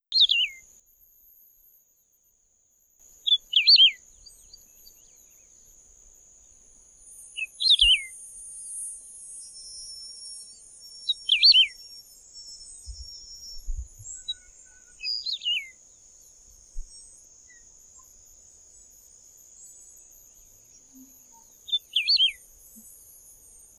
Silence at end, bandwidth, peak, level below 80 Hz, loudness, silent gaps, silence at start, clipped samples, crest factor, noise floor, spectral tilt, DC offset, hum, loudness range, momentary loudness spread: 1.45 s; 14 kHz; -8 dBFS; -48 dBFS; -20 LUFS; none; 0.1 s; under 0.1%; 20 dB; -66 dBFS; 2.5 dB/octave; under 0.1%; none; 13 LU; 29 LU